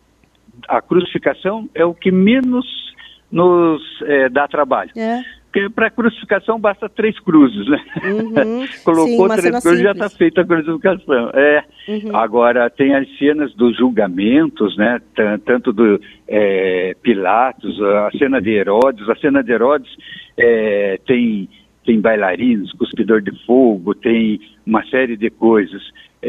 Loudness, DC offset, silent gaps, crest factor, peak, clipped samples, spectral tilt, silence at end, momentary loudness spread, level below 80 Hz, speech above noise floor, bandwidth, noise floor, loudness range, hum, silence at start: -15 LUFS; under 0.1%; none; 14 dB; 0 dBFS; under 0.1%; -6.5 dB/octave; 0 s; 8 LU; -54 dBFS; 37 dB; 13 kHz; -52 dBFS; 2 LU; none; 0.7 s